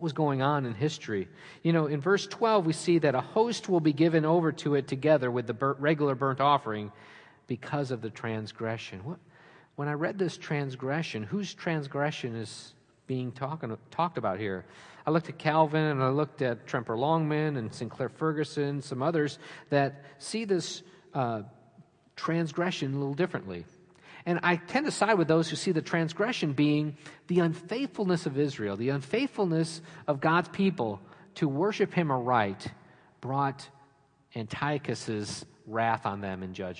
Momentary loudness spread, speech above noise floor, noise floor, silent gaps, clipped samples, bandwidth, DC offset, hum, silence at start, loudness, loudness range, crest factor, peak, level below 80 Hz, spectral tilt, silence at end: 12 LU; 34 dB; -63 dBFS; none; under 0.1%; 10.5 kHz; under 0.1%; none; 0 s; -29 LUFS; 7 LU; 20 dB; -10 dBFS; -74 dBFS; -6 dB/octave; 0 s